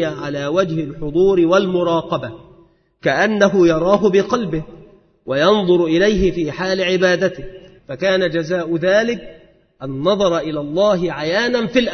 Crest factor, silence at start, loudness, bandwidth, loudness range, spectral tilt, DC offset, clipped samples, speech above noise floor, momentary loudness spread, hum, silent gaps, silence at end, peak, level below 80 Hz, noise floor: 16 dB; 0 s; -17 LUFS; 6.6 kHz; 3 LU; -5.5 dB/octave; under 0.1%; under 0.1%; 35 dB; 11 LU; none; none; 0 s; 0 dBFS; -42 dBFS; -51 dBFS